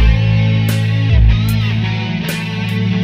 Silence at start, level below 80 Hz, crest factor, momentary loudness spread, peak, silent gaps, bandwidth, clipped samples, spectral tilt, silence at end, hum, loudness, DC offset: 0 s; -18 dBFS; 12 dB; 7 LU; 0 dBFS; none; 16 kHz; under 0.1%; -6.5 dB/octave; 0 s; none; -15 LUFS; under 0.1%